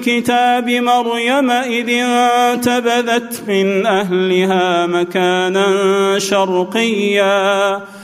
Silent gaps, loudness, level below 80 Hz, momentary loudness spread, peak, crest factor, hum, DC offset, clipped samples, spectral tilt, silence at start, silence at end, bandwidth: none; -14 LUFS; -62 dBFS; 3 LU; -2 dBFS; 12 dB; none; under 0.1%; under 0.1%; -4 dB/octave; 0 s; 0 s; 15.5 kHz